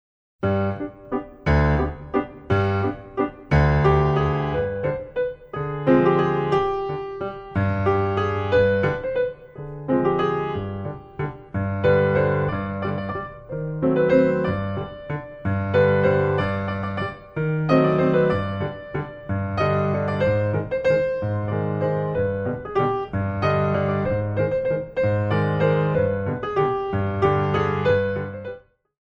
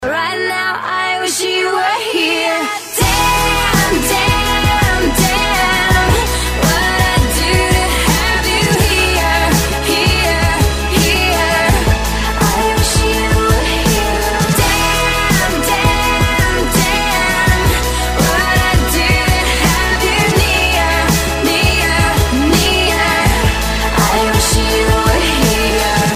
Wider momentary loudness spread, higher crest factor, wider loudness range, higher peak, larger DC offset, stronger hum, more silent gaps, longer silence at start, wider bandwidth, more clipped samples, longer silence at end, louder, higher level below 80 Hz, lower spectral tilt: first, 12 LU vs 3 LU; first, 18 dB vs 12 dB; about the same, 2 LU vs 1 LU; second, -4 dBFS vs 0 dBFS; neither; neither; neither; first, 0.4 s vs 0 s; second, 6.8 kHz vs 15.5 kHz; neither; first, 0.45 s vs 0 s; second, -23 LUFS vs -12 LUFS; second, -38 dBFS vs -20 dBFS; first, -9 dB/octave vs -3.5 dB/octave